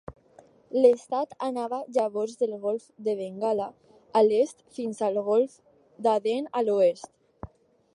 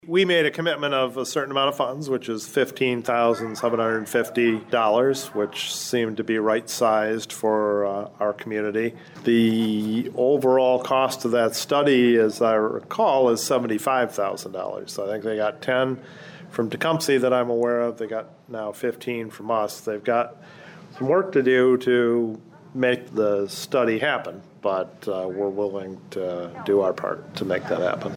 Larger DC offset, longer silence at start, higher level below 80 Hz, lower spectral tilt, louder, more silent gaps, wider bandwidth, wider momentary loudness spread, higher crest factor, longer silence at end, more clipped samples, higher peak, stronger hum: neither; about the same, 0.1 s vs 0.05 s; first, -64 dBFS vs -72 dBFS; about the same, -5.5 dB/octave vs -4.5 dB/octave; second, -26 LUFS vs -23 LUFS; neither; second, 11 kHz vs over 20 kHz; first, 14 LU vs 11 LU; first, 20 dB vs 14 dB; first, 0.5 s vs 0 s; neither; first, -6 dBFS vs -10 dBFS; neither